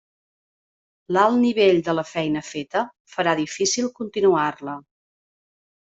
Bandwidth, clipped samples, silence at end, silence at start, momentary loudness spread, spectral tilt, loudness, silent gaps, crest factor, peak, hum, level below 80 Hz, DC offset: 8 kHz; under 0.1%; 1.1 s; 1.1 s; 10 LU; -4 dB/octave; -21 LUFS; 3.00-3.05 s; 18 dB; -4 dBFS; none; -64 dBFS; under 0.1%